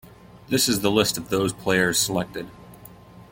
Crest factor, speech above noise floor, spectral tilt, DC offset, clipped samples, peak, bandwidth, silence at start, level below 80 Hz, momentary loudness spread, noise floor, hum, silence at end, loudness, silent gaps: 20 dB; 23 dB; -3 dB/octave; under 0.1%; under 0.1%; -4 dBFS; 17 kHz; 0.05 s; -52 dBFS; 12 LU; -46 dBFS; none; 0.1 s; -22 LUFS; none